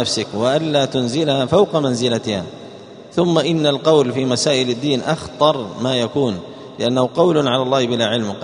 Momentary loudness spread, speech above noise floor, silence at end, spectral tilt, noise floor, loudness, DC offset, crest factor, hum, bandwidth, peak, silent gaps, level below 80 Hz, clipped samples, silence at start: 8 LU; 20 dB; 0 s; -5 dB/octave; -37 dBFS; -17 LUFS; under 0.1%; 18 dB; none; 10.5 kHz; 0 dBFS; none; -56 dBFS; under 0.1%; 0 s